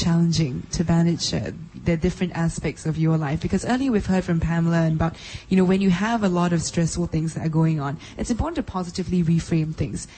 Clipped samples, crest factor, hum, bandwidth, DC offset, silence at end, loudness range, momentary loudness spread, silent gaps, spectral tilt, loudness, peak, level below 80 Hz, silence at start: under 0.1%; 14 dB; none; 8.8 kHz; under 0.1%; 0 s; 2 LU; 8 LU; none; -6 dB/octave; -23 LUFS; -8 dBFS; -40 dBFS; 0 s